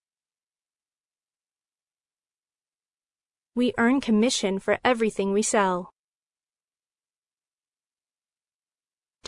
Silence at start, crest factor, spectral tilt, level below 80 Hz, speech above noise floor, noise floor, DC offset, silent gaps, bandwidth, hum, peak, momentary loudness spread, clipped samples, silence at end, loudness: 3.55 s; 22 dB; -4 dB/octave; -64 dBFS; over 67 dB; under -90 dBFS; under 0.1%; none; 11 kHz; none; -8 dBFS; 5 LU; under 0.1%; 3.4 s; -24 LUFS